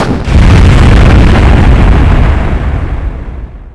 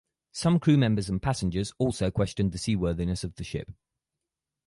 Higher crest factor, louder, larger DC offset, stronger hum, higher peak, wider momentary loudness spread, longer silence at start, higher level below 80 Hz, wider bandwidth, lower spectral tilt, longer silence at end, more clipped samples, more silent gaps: second, 4 dB vs 18 dB; first, -7 LUFS vs -27 LUFS; neither; neither; first, 0 dBFS vs -10 dBFS; about the same, 14 LU vs 14 LU; second, 0 s vs 0.35 s; first, -8 dBFS vs -44 dBFS; about the same, 11 kHz vs 11.5 kHz; about the same, -7 dB/octave vs -6.5 dB/octave; second, 0.05 s vs 0.95 s; first, 20% vs under 0.1%; neither